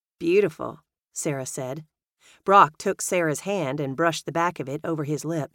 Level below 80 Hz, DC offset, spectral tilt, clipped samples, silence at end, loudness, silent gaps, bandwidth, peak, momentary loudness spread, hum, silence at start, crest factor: -68 dBFS; under 0.1%; -4.5 dB/octave; under 0.1%; 0.1 s; -24 LUFS; none; 17 kHz; -2 dBFS; 16 LU; none; 0.2 s; 22 dB